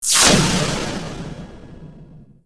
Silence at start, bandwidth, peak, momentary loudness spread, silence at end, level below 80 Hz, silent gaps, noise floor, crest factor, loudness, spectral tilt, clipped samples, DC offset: 0 s; 11 kHz; -2 dBFS; 24 LU; 0.15 s; -36 dBFS; none; -43 dBFS; 18 dB; -16 LUFS; -2.5 dB/octave; under 0.1%; under 0.1%